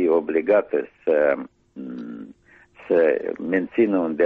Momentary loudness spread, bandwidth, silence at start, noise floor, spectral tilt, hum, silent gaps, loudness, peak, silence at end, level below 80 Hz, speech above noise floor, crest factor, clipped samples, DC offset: 17 LU; 4.6 kHz; 0 s; -52 dBFS; -9 dB/octave; none; none; -21 LUFS; -8 dBFS; 0 s; -64 dBFS; 31 dB; 14 dB; under 0.1%; under 0.1%